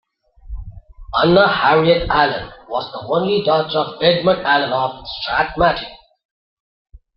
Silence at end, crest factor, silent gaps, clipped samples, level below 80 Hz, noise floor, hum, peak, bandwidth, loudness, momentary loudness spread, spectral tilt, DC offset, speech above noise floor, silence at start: 1.2 s; 16 dB; none; under 0.1%; -40 dBFS; -39 dBFS; none; -2 dBFS; 5.8 kHz; -17 LUFS; 14 LU; -8.5 dB/octave; under 0.1%; 22 dB; 0.45 s